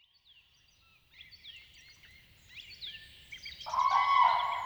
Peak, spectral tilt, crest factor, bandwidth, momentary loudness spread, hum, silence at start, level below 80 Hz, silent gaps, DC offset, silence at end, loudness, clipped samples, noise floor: -14 dBFS; -1 dB/octave; 20 dB; over 20 kHz; 25 LU; none; 1.2 s; -68 dBFS; none; under 0.1%; 0 s; -29 LUFS; under 0.1%; -66 dBFS